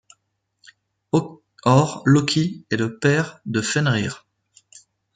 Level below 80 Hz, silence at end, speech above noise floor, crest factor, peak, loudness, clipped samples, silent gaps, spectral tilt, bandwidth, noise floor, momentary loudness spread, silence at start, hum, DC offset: -60 dBFS; 1 s; 53 dB; 20 dB; -4 dBFS; -21 LUFS; under 0.1%; none; -5.5 dB/octave; 9.4 kHz; -72 dBFS; 8 LU; 1.15 s; none; under 0.1%